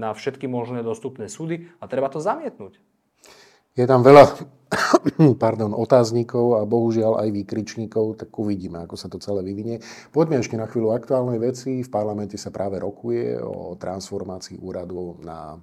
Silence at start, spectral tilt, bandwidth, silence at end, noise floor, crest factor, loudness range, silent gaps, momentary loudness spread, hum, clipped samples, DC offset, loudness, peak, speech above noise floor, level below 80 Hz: 0 s; -6.5 dB/octave; 14.5 kHz; 0 s; -52 dBFS; 22 dB; 12 LU; none; 16 LU; none; 0.1%; under 0.1%; -21 LUFS; 0 dBFS; 31 dB; -60 dBFS